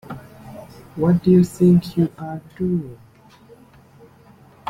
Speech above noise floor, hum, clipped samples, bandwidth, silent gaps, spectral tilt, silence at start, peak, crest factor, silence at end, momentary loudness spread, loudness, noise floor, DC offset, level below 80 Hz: 31 dB; none; under 0.1%; 12 kHz; none; -9 dB/octave; 0.1 s; -4 dBFS; 16 dB; 1.75 s; 24 LU; -18 LUFS; -49 dBFS; under 0.1%; -52 dBFS